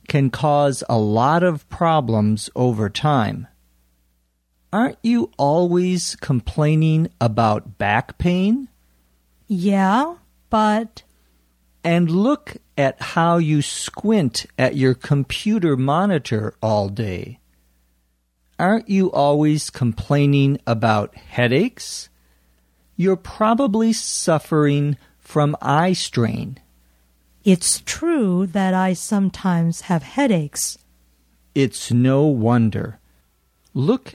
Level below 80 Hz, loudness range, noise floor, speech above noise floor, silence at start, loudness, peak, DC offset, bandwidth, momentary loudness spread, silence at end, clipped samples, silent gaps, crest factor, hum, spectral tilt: -48 dBFS; 3 LU; -66 dBFS; 47 dB; 0.1 s; -19 LUFS; -2 dBFS; under 0.1%; 15.5 kHz; 8 LU; 0.05 s; under 0.1%; none; 16 dB; none; -6 dB/octave